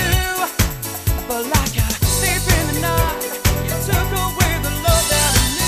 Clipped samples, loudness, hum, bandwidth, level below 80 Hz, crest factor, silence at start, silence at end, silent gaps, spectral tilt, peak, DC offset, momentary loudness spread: under 0.1%; -18 LUFS; none; 15.5 kHz; -24 dBFS; 16 dB; 0 s; 0 s; none; -3.5 dB/octave; 0 dBFS; under 0.1%; 6 LU